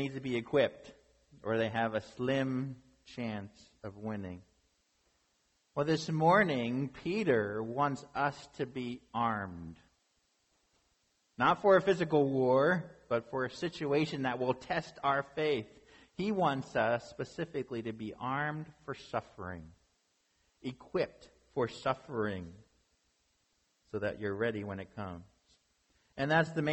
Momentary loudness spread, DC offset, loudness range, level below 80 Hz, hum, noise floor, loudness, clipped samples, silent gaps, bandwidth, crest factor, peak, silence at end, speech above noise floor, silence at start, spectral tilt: 17 LU; under 0.1%; 10 LU; -66 dBFS; none; -76 dBFS; -33 LUFS; under 0.1%; none; 8.4 kHz; 20 dB; -14 dBFS; 0 s; 43 dB; 0 s; -6.5 dB/octave